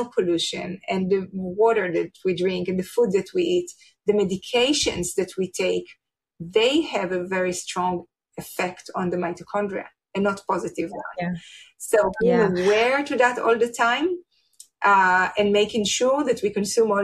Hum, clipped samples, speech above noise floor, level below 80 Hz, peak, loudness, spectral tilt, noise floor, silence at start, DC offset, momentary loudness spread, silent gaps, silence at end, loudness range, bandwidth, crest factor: none; under 0.1%; 30 dB; -56 dBFS; -4 dBFS; -23 LUFS; -4 dB/octave; -53 dBFS; 0 s; under 0.1%; 11 LU; none; 0 s; 7 LU; 14 kHz; 18 dB